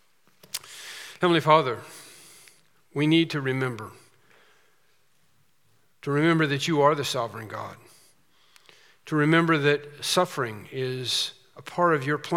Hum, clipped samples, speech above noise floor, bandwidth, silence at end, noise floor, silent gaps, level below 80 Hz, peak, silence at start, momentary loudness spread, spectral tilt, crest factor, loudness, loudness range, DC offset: none; under 0.1%; 44 dB; 17 kHz; 0 s; -68 dBFS; none; -78 dBFS; -4 dBFS; 0.55 s; 18 LU; -5 dB/octave; 24 dB; -24 LUFS; 4 LU; under 0.1%